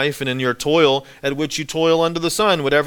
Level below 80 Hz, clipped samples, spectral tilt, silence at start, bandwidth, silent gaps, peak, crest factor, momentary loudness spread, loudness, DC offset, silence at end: -50 dBFS; under 0.1%; -4 dB/octave; 0 s; 18 kHz; none; -2 dBFS; 16 dB; 7 LU; -18 LUFS; under 0.1%; 0 s